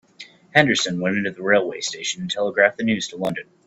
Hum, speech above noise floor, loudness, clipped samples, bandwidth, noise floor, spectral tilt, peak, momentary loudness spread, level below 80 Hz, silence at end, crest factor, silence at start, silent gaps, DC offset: none; 24 dB; -21 LUFS; under 0.1%; 12.5 kHz; -46 dBFS; -3.5 dB/octave; 0 dBFS; 9 LU; -62 dBFS; 0.25 s; 22 dB; 0.2 s; none; under 0.1%